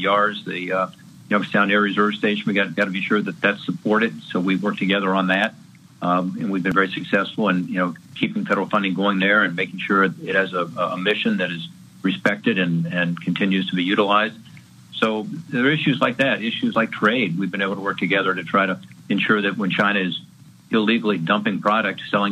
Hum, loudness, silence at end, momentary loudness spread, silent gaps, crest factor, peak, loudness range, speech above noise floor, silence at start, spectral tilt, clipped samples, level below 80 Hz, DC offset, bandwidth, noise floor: none; -21 LUFS; 0 s; 6 LU; none; 18 dB; -2 dBFS; 1 LU; 21 dB; 0 s; -6.5 dB/octave; under 0.1%; -68 dBFS; under 0.1%; 12 kHz; -42 dBFS